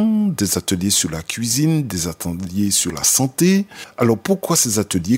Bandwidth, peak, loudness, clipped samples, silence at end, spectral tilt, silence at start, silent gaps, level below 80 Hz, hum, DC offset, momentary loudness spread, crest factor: 16.5 kHz; -2 dBFS; -18 LUFS; under 0.1%; 0 s; -4 dB/octave; 0 s; none; -48 dBFS; none; under 0.1%; 8 LU; 18 dB